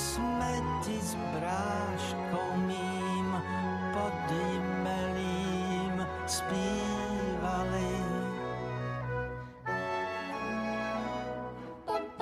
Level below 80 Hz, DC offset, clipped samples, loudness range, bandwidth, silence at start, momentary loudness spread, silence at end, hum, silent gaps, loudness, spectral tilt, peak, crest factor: -52 dBFS; under 0.1%; under 0.1%; 3 LU; 15 kHz; 0 s; 4 LU; 0 s; none; none; -34 LUFS; -5 dB/octave; -20 dBFS; 14 dB